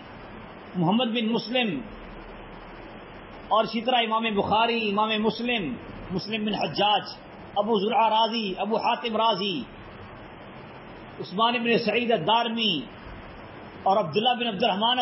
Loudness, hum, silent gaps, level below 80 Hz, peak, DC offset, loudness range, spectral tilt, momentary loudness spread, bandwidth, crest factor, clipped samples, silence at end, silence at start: -25 LUFS; none; none; -54 dBFS; -8 dBFS; under 0.1%; 3 LU; -8.5 dB/octave; 20 LU; 5.8 kHz; 18 dB; under 0.1%; 0 s; 0 s